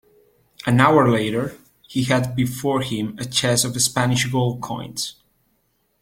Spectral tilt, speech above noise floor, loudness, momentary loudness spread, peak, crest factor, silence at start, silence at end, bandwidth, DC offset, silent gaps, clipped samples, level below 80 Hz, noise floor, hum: -4.5 dB/octave; 47 dB; -20 LUFS; 13 LU; -2 dBFS; 20 dB; 0.65 s; 0.9 s; 16.5 kHz; under 0.1%; none; under 0.1%; -54 dBFS; -67 dBFS; none